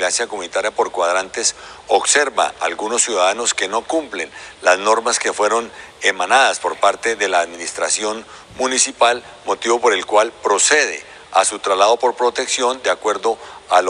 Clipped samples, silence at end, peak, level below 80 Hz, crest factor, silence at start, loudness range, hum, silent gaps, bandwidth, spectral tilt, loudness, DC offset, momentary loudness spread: under 0.1%; 0 s; 0 dBFS; -60 dBFS; 16 dB; 0 s; 2 LU; none; none; 11 kHz; 0 dB/octave; -17 LUFS; under 0.1%; 9 LU